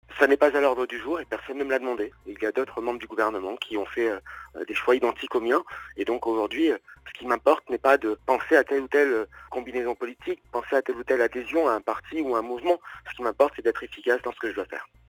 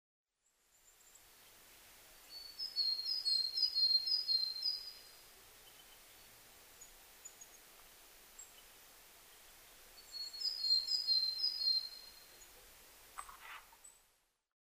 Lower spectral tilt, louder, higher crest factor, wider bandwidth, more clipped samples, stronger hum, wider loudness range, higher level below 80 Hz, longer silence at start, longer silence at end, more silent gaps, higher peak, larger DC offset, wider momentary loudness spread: first, -4.5 dB/octave vs 2 dB/octave; first, -26 LUFS vs -34 LUFS; about the same, 22 dB vs 18 dB; first, 19 kHz vs 15.5 kHz; neither; neither; second, 5 LU vs 22 LU; first, -60 dBFS vs -74 dBFS; second, 0.1 s vs 1.45 s; second, 0.25 s vs 0.8 s; neither; first, -4 dBFS vs -24 dBFS; neither; second, 12 LU vs 27 LU